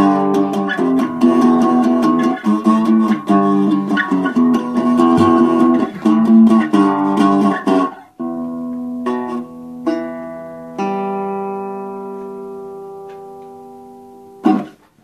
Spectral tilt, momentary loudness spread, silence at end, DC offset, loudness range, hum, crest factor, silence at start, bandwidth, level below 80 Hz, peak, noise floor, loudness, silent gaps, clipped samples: -7.5 dB/octave; 18 LU; 0.35 s; under 0.1%; 12 LU; none; 14 dB; 0 s; 11 kHz; -60 dBFS; 0 dBFS; -39 dBFS; -15 LUFS; none; under 0.1%